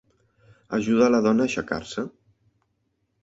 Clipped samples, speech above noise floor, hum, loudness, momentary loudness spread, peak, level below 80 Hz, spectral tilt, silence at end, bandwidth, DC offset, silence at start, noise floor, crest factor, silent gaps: under 0.1%; 51 dB; none; -23 LUFS; 14 LU; -6 dBFS; -58 dBFS; -5.5 dB/octave; 1.15 s; 8 kHz; under 0.1%; 0.7 s; -73 dBFS; 18 dB; none